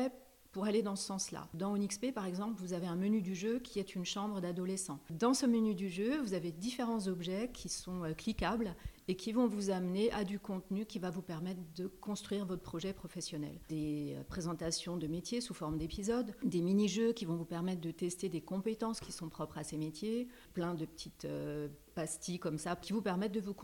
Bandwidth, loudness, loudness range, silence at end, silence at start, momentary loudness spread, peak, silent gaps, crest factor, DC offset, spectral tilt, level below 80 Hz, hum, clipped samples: 18 kHz; -38 LUFS; 5 LU; 0 s; 0 s; 9 LU; -20 dBFS; none; 18 dB; under 0.1%; -5 dB/octave; -60 dBFS; none; under 0.1%